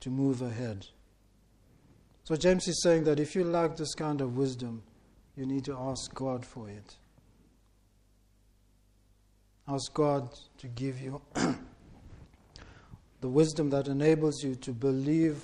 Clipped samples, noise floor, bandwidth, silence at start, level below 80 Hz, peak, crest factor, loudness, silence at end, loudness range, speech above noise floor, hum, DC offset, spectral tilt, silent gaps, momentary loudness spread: under 0.1%; -65 dBFS; 11.5 kHz; 0 s; -58 dBFS; -12 dBFS; 20 dB; -31 LUFS; 0 s; 10 LU; 35 dB; 50 Hz at -65 dBFS; under 0.1%; -6 dB/octave; none; 18 LU